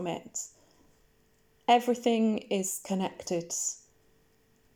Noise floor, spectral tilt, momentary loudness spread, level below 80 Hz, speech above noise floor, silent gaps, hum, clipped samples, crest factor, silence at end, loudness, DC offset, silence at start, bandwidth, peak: -67 dBFS; -3.5 dB/octave; 13 LU; -72 dBFS; 38 dB; none; none; under 0.1%; 22 dB; 1 s; -30 LUFS; under 0.1%; 0 s; over 20 kHz; -10 dBFS